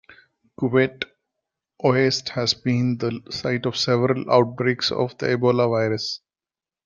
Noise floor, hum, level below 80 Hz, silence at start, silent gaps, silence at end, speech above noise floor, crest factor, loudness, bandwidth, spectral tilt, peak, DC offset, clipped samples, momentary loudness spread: under -90 dBFS; none; -62 dBFS; 0.6 s; none; 0.7 s; over 69 dB; 20 dB; -22 LUFS; 7.4 kHz; -5.5 dB/octave; -2 dBFS; under 0.1%; under 0.1%; 9 LU